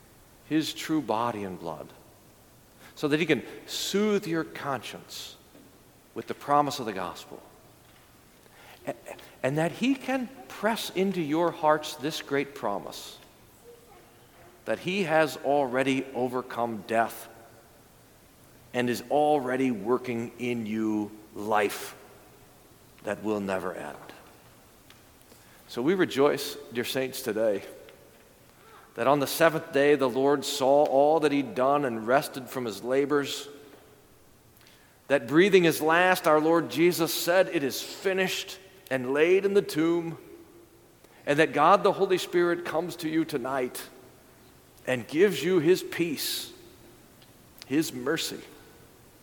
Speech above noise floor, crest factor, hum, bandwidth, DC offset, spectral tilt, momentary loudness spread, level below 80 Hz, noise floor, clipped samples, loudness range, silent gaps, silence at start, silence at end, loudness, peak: 30 dB; 22 dB; none; 19 kHz; under 0.1%; -4.5 dB/octave; 17 LU; -66 dBFS; -57 dBFS; under 0.1%; 9 LU; none; 0.5 s; 0.65 s; -27 LUFS; -6 dBFS